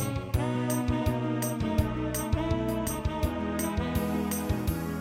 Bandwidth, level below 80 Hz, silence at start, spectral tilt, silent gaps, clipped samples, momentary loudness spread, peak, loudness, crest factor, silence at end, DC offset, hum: 17 kHz; -38 dBFS; 0 s; -6 dB/octave; none; under 0.1%; 2 LU; -12 dBFS; -30 LUFS; 16 dB; 0 s; under 0.1%; none